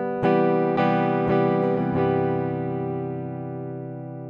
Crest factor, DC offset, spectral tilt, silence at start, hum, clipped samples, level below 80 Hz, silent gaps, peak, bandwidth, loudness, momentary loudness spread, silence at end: 16 dB; under 0.1%; -10 dB/octave; 0 s; none; under 0.1%; -58 dBFS; none; -8 dBFS; 5.4 kHz; -23 LUFS; 12 LU; 0 s